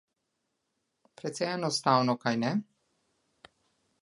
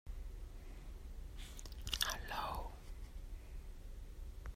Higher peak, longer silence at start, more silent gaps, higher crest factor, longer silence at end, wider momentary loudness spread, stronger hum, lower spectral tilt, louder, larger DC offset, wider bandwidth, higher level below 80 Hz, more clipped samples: first, -8 dBFS vs -18 dBFS; first, 1.25 s vs 0.05 s; neither; about the same, 24 dB vs 28 dB; first, 1.4 s vs 0 s; second, 11 LU vs 16 LU; neither; first, -5 dB/octave vs -2.5 dB/octave; first, -29 LUFS vs -47 LUFS; neither; second, 11.5 kHz vs 16 kHz; second, -80 dBFS vs -48 dBFS; neither